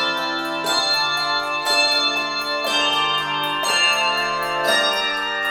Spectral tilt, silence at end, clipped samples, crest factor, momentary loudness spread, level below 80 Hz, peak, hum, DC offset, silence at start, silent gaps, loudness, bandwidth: -0.5 dB/octave; 0 s; under 0.1%; 16 dB; 5 LU; -56 dBFS; -4 dBFS; none; under 0.1%; 0 s; none; -18 LUFS; 18 kHz